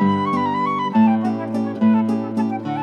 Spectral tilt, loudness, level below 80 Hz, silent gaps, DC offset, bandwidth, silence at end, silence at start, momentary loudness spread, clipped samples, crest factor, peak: -8 dB/octave; -19 LUFS; -76 dBFS; none; under 0.1%; 6.4 kHz; 0 s; 0 s; 6 LU; under 0.1%; 12 dB; -6 dBFS